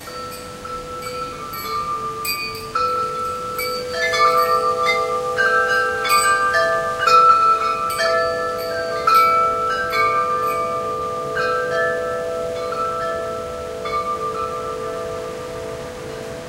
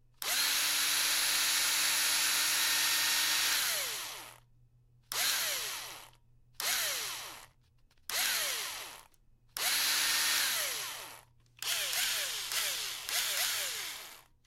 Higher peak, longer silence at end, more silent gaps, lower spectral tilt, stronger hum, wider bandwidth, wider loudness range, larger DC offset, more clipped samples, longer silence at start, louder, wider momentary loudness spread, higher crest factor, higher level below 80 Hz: first, -2 dBFS vs -14 dBFS; second, 0 s vs 0.25 s; neither; first, -2.5 dB/octave vs 2.5 dB/octave; neither; about the same, 16.5 kHz vs 16 kHz; about the same, 9 LU vs 8 LU; neither; neither; second, 0 s vs 0.2 s; first, -19 LUFS vs -30 LUFS; about the same, 14 LU vs 15 LU; about the same, 18 dB vs 20 dB; first, -48 dBFS vs -68 dBFS